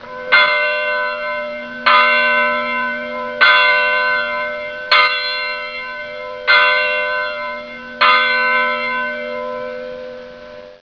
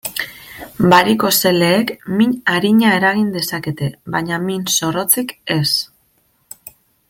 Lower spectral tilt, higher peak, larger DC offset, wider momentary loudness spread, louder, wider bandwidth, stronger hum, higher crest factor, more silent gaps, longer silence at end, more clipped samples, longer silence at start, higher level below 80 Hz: second, -2.5 dB/octave vs -4 dB/octave; about the same, 0 dBFS vs 0 dBFS; neither; about the same, 16 LU vs 17 LU; about the same, -14 LUFS vs -15 LUFS; second, 5.4 kHz vs 17 kHz; neither; about the same, 16 dB vs 16 dB; neither; second, 0.05 s vs 1.25 s; neither; about the same, 0 s vs 0.05 s; about the same, -56 dBFS vs -52 dBFS